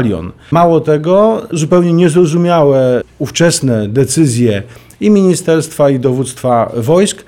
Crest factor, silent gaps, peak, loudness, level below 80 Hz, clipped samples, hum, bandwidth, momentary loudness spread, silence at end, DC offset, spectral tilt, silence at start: 10 dB; none; 0 dBFS; -11 LUFS; -46 dBFS; under 0.1%; none; 16.5 kHz; 7 LU; 0.05 s; 0.2%; -6 dB/octave; 0 s